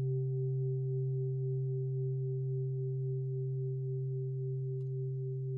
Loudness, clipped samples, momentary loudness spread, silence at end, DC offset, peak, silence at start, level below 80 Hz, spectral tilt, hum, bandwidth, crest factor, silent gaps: -36 LUFS; under 0.1%; 3 LU; 0 s; under 0.1%; -28 dBFS; 0 s; -72 dBFS; -15 dB/octave; none; 0.8 kHz; 8 dB; none